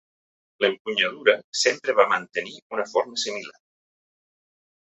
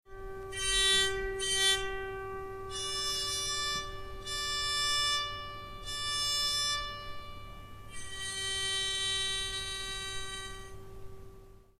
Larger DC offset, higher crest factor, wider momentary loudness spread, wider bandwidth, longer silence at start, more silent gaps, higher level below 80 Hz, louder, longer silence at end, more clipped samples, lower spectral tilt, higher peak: neither; about the same, 22 dB vs 18 dB; second, 11 LU vs 19 LU; second, 8.4 kHz vs 15.5 kHz; first, 0.6 s vs 0.05 s; first, 0.80-0.85 s, 1.44-1.53 s, 2.62-2.70 s vs none; second, -76 dBFS vs -48 dBFS; first, -23 LUFS vs -31 LUFS; first, 1.35 s vs 0.15 s; neither; about the same, -1.5 dB/octave vs -0.5 dB/octave; first, -4 dBFS vs -16 dBFS